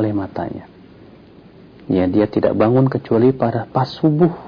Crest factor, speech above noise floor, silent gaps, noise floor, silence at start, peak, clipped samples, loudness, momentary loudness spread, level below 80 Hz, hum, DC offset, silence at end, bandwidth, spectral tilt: 14 dB; 27 dB; none; -43 dBFS; 0 s; -4 dBFS; under 0.1%; -17 LUFS; 11 LU; -50 dBFS; none; under 0.1%; 0 s; 5.4 kHz; -10 dB/octave